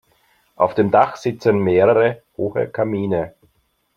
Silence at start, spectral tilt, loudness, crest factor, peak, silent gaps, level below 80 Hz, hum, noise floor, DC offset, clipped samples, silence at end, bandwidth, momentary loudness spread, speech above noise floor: 0.6 s; -8 dB/octave; -18 LUFS; 18 dB; -2 dBFS; none; -58 dBFS; none; -64 dBFS; under 0.1%; under 0.1%; 0.65 s; 7.2 kHz; 9 LU; 47 dB